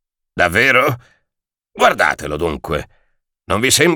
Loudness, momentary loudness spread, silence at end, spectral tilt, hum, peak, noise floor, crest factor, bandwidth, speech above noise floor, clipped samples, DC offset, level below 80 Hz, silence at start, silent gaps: -15 LUFS; 12 LU; 0 s; -3 dB/octave; none; 0 dBFS; -82 dBFS; 16 dB; 19 kHz; 66 dB; under 0.1%; under 0.1%; -40 dBFS; 0.35 s; none